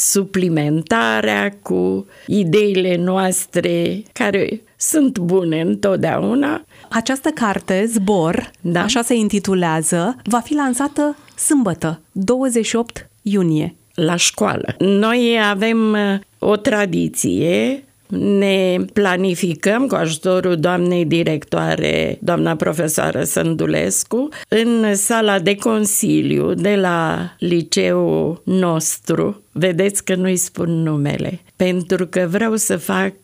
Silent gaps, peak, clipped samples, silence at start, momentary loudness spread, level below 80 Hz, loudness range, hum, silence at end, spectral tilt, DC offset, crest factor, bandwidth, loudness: none; -2 dBFS; under 0.1%; 0 s; 6 LU; -54 dBFS; 2 LU; none; 0.1 s; -4.5 dB/octave; under 0.1%; 16 dB; 16 kHz; -17 LUFS